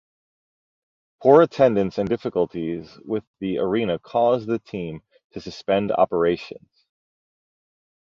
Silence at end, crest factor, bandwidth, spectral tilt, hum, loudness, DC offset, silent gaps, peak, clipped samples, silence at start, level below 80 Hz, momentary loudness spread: 1.5 s; 20 dB; 7.2 kHz; -7.5 dB/octave; none; -22 LUFS; under 0.1%; 3.27-3.34 s, 5.24-5.30 s; -2 dBFS; under 0.1%; 1.2 s; -56 dBFS; 18 LU